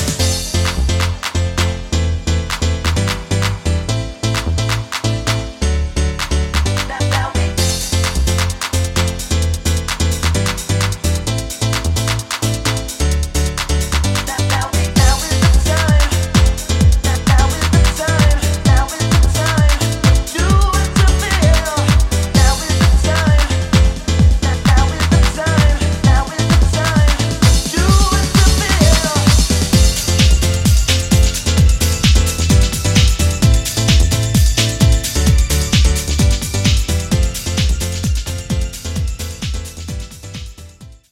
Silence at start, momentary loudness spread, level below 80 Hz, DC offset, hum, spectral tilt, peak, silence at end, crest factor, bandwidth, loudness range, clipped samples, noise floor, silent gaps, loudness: 0 s; 6 LU; -18 dBFS; under 0.1%; none; -4.5 dB/octave; 0 dBFS; 0.2 s; 14 dB; 16.5 kHz; 5 LU; under 0.1%; -37 dBFS; none; -15 LUFS